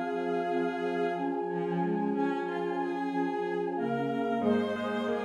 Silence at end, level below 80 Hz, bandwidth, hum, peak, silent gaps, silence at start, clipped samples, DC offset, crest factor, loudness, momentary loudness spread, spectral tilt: 0 s; -78 dBFS; 10.5 kHz; none; -16 dBFS; none; 0 s; under 0.1%; under 0.1%; 14 dB; -31 LUFS; 3 LU; -7.5 dB/octave